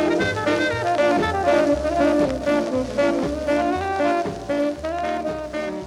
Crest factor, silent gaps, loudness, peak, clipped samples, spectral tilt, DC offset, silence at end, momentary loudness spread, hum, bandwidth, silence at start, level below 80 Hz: 14 dB; none; -21 LUFS; -6 dBFS; under 0.1%; -5.5 dB/octave; under 0.1%; 0 s; 6 LU; none; 13.5 kHz; 0 s; -42 dBFS